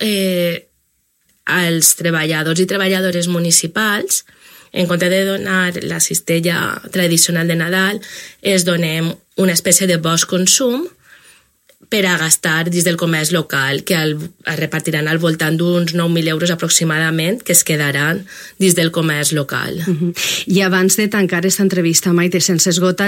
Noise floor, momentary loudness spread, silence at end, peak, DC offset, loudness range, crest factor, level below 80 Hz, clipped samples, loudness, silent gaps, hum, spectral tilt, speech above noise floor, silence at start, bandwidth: -63 dBFS; 8 LU; 0 s; 0 dBFS; under 0.1%; 2 LU; 16 dB; -60 dBFS; under 0.1%; -15 LUFS; none; none; -3.5 dB/octave; 47 dB; 0 s; 16.5 kHz